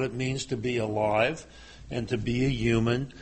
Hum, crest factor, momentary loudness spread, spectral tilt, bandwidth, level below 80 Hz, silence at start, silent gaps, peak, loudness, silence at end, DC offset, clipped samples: none; 18 dB; 12 LU; -6 dB/octave; 8.4 kHz; -46 dBFS; 0 s; none; -10 dBFS; -28 LUFS; 0 s; under 0.1%; under 0.1%